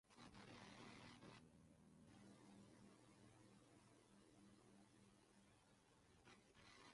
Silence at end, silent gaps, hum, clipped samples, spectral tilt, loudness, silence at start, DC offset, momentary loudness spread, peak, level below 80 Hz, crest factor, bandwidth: 0 s; none; 50 Hz at -80 dBFS; under 0.1%; -4.5 dB/octave; -65 LUFS; 0.05 s; under 0.1%; 7 LU; -48 dBFS; -84 dBFS; 20 dB; 11 kHz